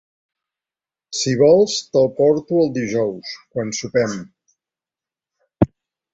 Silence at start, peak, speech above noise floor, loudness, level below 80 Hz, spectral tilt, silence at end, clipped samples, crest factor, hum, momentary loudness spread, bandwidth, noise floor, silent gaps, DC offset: 1.1 s; -2 dBFS; over 72 dB; -18 LUFS; -48 dBFS; -5 dB/octave; 0.45 s; under 0.1%; 18 dB; none; 14 LU; 8 kHz; under -90 dBFS; none; under 0.1%